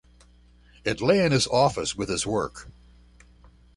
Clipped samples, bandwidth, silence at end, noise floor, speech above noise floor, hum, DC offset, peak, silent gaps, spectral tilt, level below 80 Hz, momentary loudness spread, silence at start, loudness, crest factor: under 0.1%; 11.5 kHz; 1.05 s; -55 dBFS; 31 dB; 60 Hz at -50 dBFS; under 0.1%; -8 dBFS; none; -4.5 dB/octave; -50 dBFS; 12 LU; 0.85 s; -24 LUFS; 20 dB